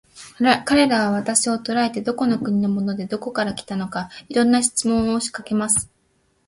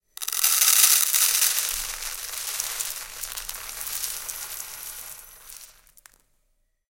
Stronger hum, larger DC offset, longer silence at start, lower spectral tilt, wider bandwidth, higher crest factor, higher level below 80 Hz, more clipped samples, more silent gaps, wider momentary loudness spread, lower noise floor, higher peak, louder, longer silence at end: neither; neither; about the same, 0.15 s vs 0.2 s; first, -3.5 dB/octave vs 4 dB/octave; second, 11.5 kHz vs 17.5 kHz; second, 18 dB vs 26 dB; about the same, -52 dBFS vs -54 dBFS; neither; neither; second, 10 LU vs 22 LU; second, -64 dBFS vs -70 dBFS; about the same, -2 dBFS vs 0 dBFS; about the same, -20 LUFS vs -22 LUFS; second, 0.6 s vs 1.2 s